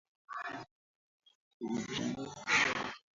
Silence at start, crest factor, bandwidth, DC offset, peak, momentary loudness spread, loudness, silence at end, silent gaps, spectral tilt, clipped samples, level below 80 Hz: 0.3 s; 22 dB; 7.6 kHz; under 0.1%; -16 dBFS; 17 LU; -35 LUFS; 0.2 s; 0.71-1.20 s, 1.35-1.60 s; -1.5 dB/octave; under 0.1%; -70 dBFS